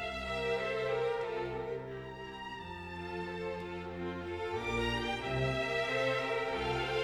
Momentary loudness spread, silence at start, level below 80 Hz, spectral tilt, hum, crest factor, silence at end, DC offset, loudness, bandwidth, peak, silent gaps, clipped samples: 11 LU; 0 s; -52 dBFS; -5.5 dB/octave; none; 16 dB; 0 s; under 0.1%; -36 LUFS; 14 kHz; -20 dBFS; none; under 0.1%